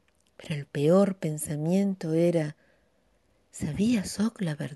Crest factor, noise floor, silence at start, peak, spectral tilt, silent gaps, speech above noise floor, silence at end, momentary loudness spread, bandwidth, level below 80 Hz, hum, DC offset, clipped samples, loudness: 16 dB; -68 dBFS; 0.4 s; -12 dBFS; -6.5 dB/octave; none; 42 dB; 0 s; 13 LU; 12 kHz; -58 dBFS; none; under 0.1%; under 0.1%; -27 LUFS